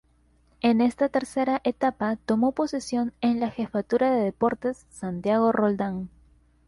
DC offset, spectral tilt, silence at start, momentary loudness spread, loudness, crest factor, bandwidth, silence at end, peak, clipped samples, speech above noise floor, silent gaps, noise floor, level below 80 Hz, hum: under 0.1%; -6.5 dB/octave; 0.65 s; 9 LU; -25 LUFS; 16 dB; 11.5 kHz; 0.6 s; -10 dBFS; under 0.1%; 38 dB; none; -62 dBFS; -58 dBFS; none